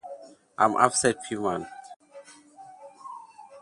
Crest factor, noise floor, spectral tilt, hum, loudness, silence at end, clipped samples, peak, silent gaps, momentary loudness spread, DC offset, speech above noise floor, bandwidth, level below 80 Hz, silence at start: 26 dB; -50 dBFS; -3 dB/octave; none; -25 LUFS; 0 s; under 0.1%; -2 dBFS; 1.96-2.00 s; 26 LU; under 0.1%; 25 dB; 11.5 kHz; -66 dBFS; 0.05 s